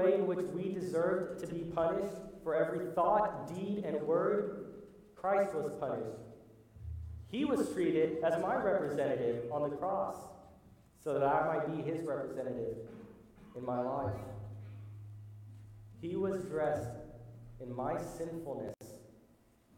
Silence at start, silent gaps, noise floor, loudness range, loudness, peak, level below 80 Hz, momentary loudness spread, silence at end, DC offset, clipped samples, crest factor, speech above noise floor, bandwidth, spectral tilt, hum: 0 s; none; -66 dBFS; 7 LU; -36 LUFS; -18 dBFS; -62 dBFS; 20 LU; 0.6 s; under 0.1%; under 0.1%; 18 dB; 31 dB; 17 kHz; -7 dB/octave; none